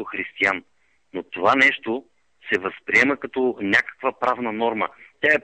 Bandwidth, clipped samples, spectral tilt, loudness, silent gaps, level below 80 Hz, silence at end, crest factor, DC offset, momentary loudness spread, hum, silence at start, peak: 9 kHz; under 0.1%; -4 dB/octave; -21 LUFS; none; -64 dBFS; 0.05 s; 18 dB; under 0.1%; 13 LU; none; 0 s; -4 dBFS